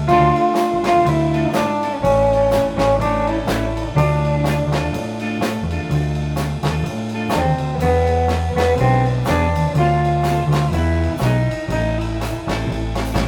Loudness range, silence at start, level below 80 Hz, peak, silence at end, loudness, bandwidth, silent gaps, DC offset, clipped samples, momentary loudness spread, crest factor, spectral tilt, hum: 3 LU; 0 s; -28 dBFS; -2 dBFS; 0 s; -18 LUFS; 18 kHz; none; under 0.1%; under 0.1%; 7 LU; 14 dB; -7 dB/octave; none